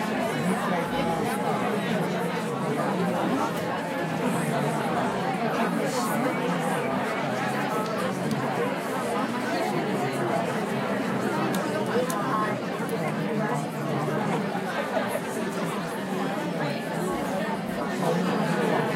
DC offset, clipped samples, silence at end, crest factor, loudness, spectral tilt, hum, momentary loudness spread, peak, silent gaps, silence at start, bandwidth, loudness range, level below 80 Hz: under 0.1%; under 0.1%; 0 s; 16 dB; -27 LUFS; -5.5 dB/octave; none; 3 LU; -10 dBFS; none; 0 s; 16 kHz; 2 LU; -62 dBFS